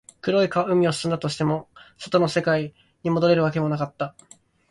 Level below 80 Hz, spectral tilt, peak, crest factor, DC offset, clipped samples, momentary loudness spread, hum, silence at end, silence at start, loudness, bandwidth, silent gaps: -58 dBFS; -6 dB/octave; -6 dBFS; 18 dB; under 0.1%; under 0.1%; 12 LU; none; 0.6 s; 0.25 s; -23 LUFS; 11.5 kHz; none